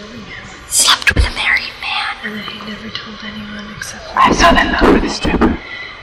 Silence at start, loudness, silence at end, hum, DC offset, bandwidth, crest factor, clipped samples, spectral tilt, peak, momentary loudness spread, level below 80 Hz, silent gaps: 0 s; -13 LUFS; 0 s; none; under 0.1%; 16.5 kHz; 16 dB; under 0.1%; -3 dB/octave; 0 dBFS; 18 LU; -26 dBFS; none